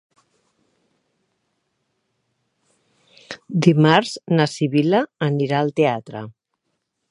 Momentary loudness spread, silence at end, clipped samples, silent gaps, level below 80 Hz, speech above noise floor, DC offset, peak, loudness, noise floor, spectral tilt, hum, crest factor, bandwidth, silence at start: 20 LU; 0.8 s; under 0.1%; none; -68 dBFS; 57 dB; under 0.1%; 0 dBFS; -19 LUFS; -75 dBFS; -6.5 dB/octave; none; 22 dB; 11 kHz; 3.3 s